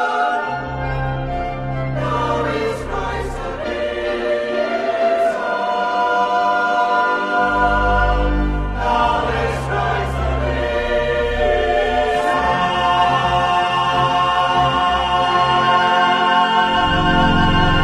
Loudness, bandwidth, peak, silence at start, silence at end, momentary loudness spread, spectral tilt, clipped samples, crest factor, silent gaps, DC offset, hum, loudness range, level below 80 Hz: -17 LUFS; 12 kHz; -2 dBFS; 0 s; 0 s; 8 LU; -5.5 dB/octave; under 0.1%; 14 dB; none; under 0.1%; none; 6 LU; -28 dBFS